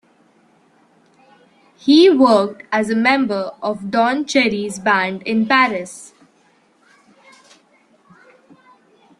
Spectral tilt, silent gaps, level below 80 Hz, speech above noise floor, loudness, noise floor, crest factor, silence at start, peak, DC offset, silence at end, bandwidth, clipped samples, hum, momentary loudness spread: -4.5 dB/octave; none; -64 dBFS; 41 dB; -16 LUFS; -57 dBFS; 18 dB; 1.85 s; -2 dBFS; under 0.1%; 3.15 s; 11.5 kHz; under 0.1%; none; 13 LU